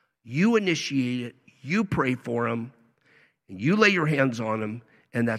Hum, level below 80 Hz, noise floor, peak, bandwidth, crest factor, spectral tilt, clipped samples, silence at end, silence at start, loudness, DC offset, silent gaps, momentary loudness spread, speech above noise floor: none; -60 dBFS; -62 dBFS; -6 dBFS; 12.5 kHz; 20 dB; -6 dB/octave; under 0.1%; 0 s; 0.25 s; -25 LUFS; under 0.1%; none; 18 LU; 37 dB